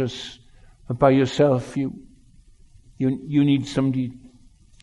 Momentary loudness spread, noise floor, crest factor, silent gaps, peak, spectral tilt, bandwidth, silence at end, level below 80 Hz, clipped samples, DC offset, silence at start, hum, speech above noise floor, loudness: 15 LU; -51 dBFS; 20 dB; none; -4 dBFS; -7 dB/octave; 11 kHz; 0.55 s; -52 dBFS; under 0.1%; under 0.1%; 0 s; none; 31 dB; -22 LUFS